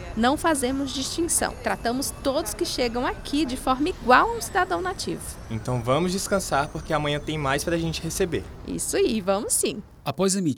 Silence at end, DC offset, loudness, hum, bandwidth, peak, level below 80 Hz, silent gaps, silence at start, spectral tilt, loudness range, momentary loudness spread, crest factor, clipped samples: 0 s; under 0.1%; -25 LUFS; none; over 20 kHz; -4 dBFS; -42 dBFS; none; 0 s; -4 dB/octave; 2 LU; 7 LU; 22 dB; under 0.1%